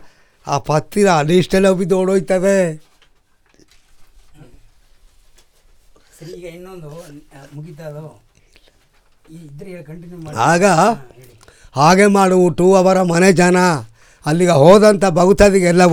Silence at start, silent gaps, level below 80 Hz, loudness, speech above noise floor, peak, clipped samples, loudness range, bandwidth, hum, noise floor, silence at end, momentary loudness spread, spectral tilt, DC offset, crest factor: 0.05 s; none; -40 dBFS; -13 LUFS; 41 dB; 0 dBFS; under 0.1%; 24 LU; 17.5 kHz; none; -55 dBFS; 0 s; 24 LU; -5.5 dB/octave; under 0.1%; 16 dB